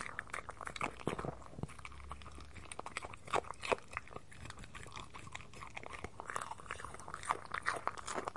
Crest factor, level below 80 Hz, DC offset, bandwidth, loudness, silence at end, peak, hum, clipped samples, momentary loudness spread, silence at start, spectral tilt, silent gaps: 28 dB; -60 dBFS; 0.2%; 11.5 kHz; -44 LUFS; 0 s; -16 dBFS; none; under 0.1%; 12 LU; 0 s; -3.5 dB/octave; none